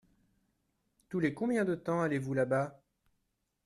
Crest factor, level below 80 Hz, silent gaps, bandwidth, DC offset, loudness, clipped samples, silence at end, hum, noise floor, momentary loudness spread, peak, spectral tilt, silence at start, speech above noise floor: 18 dB; -72 dBFS; none; 12.5 kHz; under 0.1%; -33 LUFS; under 0.1%; 0.95 s; none; -81 dBFS; 4 LU; -16 dBFS; -7.5 dB/octave; 1.1 s; 49 dB